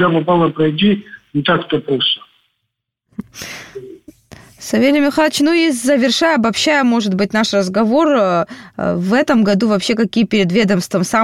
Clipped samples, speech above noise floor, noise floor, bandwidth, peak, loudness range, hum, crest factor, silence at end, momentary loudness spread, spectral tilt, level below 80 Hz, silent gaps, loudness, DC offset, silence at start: under 0.1%; 60 dB; -74 dBFS; 15 kHz; -2 dBFS; 7 LU; none; 14 dB; 0 s; 16 LU; -5 dB/octave; -52 dBFS; none; -14 LUFS; under 0.1%; 0 s